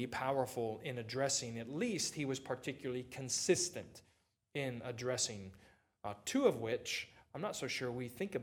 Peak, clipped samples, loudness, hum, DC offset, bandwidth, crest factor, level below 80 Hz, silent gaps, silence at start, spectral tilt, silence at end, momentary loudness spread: -18 dBFS; under 0.1%; -39 LUFS; none; under 0.1%; 19 kHz; 22 dB; -74 dBFS; none; 0 s; -3.5 dB/octave; 0 s; 12 LU